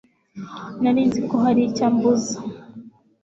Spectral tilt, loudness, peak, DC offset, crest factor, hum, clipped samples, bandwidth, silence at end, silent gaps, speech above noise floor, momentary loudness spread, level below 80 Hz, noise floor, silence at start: -6 dB/octave; -20 LUFS; -6 dBFS; under 0.1%; 14 dB; none; under 0.1%; 7.8 kHz; 0.35 s; none; 24 dB; 18 LU; -60 dBFS; -43 dBFS; 0.35 s